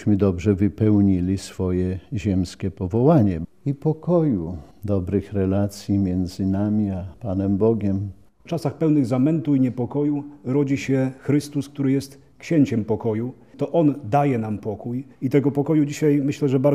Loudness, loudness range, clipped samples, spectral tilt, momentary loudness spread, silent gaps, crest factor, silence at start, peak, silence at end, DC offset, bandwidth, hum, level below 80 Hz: -22 LUFS; 2 LU; under 0.1%; -8.5 dB/octave; 9 LU; none; 18 dB; 0 s; -4 dBFS; 0 s; 0.2%; 13.5 kHz; none; -50 dBFS